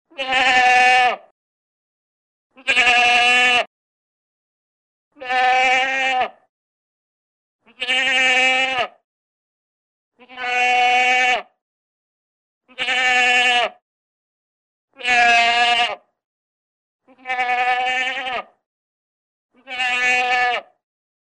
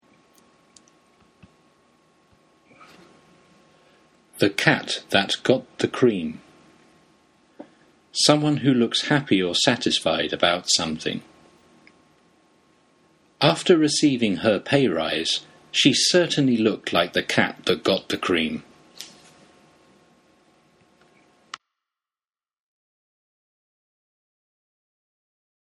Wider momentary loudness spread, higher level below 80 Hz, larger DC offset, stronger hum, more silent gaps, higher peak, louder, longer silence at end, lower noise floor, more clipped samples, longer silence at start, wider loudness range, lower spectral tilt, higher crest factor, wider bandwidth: about the same, 14 LU vs 13 LU; about the same, -62 dBFS vs -62 dBFS; neither; neither; first, 1.31-2.50 s, 3.67-5.11 s, 6.49-7.59 s, 9.04-10.12 s, 11.61-12.61 s, 13.82-14.88 s, 16.25-16.99 s, 18.66-19.49 s vs none; about the same, -2 dBFS vs 0 dBFS; first, -16 LUFS vs -21 LUFS; second, 0.6 s vs 6.55 s; about the same, under -90 dBFS vs under -90 dBFS; neither; second, 0.2 s vs 4.35 s; about the same, 5 LU vs 7 LU; second, 0 dB/octave vs -4 dB/octave; second, 18 dB vs 24 dB; second, 10.5 kHz vs 13.5 kHz